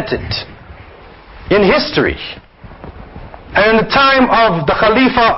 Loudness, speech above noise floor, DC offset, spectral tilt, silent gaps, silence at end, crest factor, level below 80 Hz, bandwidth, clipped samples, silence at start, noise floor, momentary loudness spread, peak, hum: -12 LUFS; 26 dB; under 0.1%; -3 dB/octave; none; 0 s; 14 dB; -34 dBFS; 6 kHz; under 0.1%; 0 s; -37 dBFS; 23 LU; 0 dBFS; none